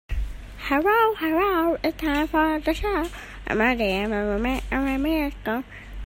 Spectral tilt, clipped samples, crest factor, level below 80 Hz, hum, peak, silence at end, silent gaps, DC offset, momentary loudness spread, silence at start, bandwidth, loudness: -6 dB/octave; under 0.1%; 18 dB; -36 dBFS; none; -6 dBFS; 0 s; none; under 0.1%; 12 LU; 0.1 s; 16.5 kHz; -24 LUFS